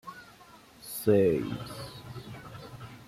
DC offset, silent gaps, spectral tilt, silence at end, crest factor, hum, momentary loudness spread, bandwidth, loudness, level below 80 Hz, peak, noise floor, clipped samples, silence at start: under 0.1%; none; -6.5 dB/octave; 0 s; 20 dB; none; 23 LU; 16 kHz; -28 LUFS; -60 dBFS; -12 dBFS; -54 dBFS; under 0.1%; 0.05 s